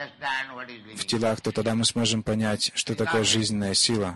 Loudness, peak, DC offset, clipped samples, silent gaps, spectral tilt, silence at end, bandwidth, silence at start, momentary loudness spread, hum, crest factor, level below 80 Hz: -24 LUFS; -10 dBFS; under 0.1%; under 0.1%; none; -3.5 dB/octave; 0 s; 12 kHz; 0 s; 9 LU; none; 16 dB; -52 dBFS